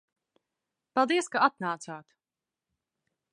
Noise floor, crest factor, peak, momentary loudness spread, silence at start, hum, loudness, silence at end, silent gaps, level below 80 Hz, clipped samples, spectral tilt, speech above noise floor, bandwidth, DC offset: under -90 dBFS; 24 dB; -8 dBFS; 16 LU; 0.95 s; none; -28 LUFS; 1.35 s; none; -88 dBFS; under 0.1%; -3.5 dB/octave; over 62 dB; 11.5 kHz; under 0.1%